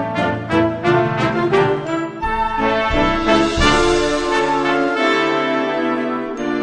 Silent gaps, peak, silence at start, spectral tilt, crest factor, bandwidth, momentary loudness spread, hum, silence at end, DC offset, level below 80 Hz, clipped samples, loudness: none; -2 dBFS; 0 s; -5 dB/octave; 16 dB; 10.5 kHz; 7 LU; none; 0 s; under 0.1%; -32 dBFS; under 0.1%; -17 LUFS